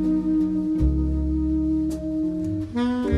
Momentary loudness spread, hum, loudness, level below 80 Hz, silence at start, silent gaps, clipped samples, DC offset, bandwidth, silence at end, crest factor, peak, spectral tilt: 4 LU; none; -24 LUFS; -30 dBFS; 0 s; none; under 0.1%; under 0.1%; 9 kHz; 0 s; 14 dB; -8 dBFS; -9 dB/octave